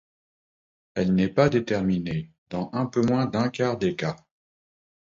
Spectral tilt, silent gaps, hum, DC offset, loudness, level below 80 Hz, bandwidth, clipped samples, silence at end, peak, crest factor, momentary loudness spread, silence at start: -7 dB/octave; 2.38-2.46 s; none; under 0.1%; -25 LUFS; -54 dBFS; 7.6 kHz; under 0.1%; 0.9 s; -6 dBFS; 20 dB; 11 LU; 0.95 s